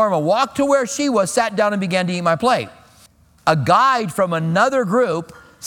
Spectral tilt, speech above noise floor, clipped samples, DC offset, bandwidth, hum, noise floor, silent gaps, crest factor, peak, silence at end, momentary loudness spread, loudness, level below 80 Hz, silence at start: -5 dB/octave; 34 dB; under 0.1%; under 0.1%; 18 kHz; none; -51 dBFS; none; 18 dB; 0 dBFS; 0 s; 6 LU; -18 LUFS; -56 dBFS; 0 s